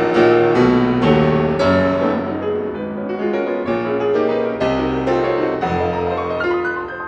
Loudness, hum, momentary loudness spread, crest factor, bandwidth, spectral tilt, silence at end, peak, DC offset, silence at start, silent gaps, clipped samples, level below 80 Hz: -17 LUFS; none; 8 LU; 16 dB; 8 kHz; -7.5 dB/octave; 0 s; -2 dBFS; under 0.1%; 0 s; none; under 0.1%; -42 dBFS